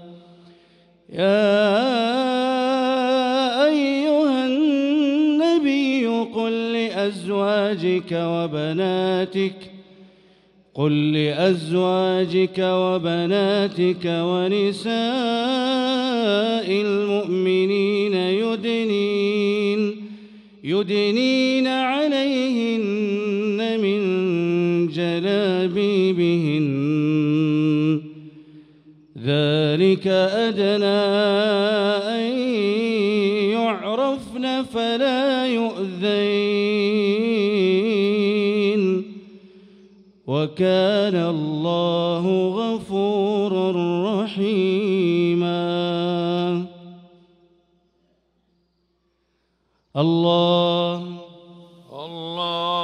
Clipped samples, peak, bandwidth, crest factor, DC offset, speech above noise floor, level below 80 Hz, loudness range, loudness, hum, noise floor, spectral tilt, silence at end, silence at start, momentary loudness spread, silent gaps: under 0.1%; -6 dBFS; 11 kHz; 14 dB; under 0.1%; 49 dB; -66 dBFS; 4 LU; -20 LUFS; none; -69 dBFS; -6.5 dB/octave; 0 s; 0 s; 6 LU; none